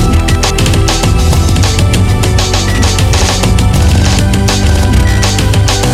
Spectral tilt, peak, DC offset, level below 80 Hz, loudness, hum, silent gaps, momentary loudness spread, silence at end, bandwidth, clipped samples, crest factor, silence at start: -4.5 dB/octave; 0 dBFS; under 0.1%; -12 dBFS; -9 LUFS; none; none; 1 LU; 0 s; 15.5 kHz; under 0.1%; 8 dB; 0 s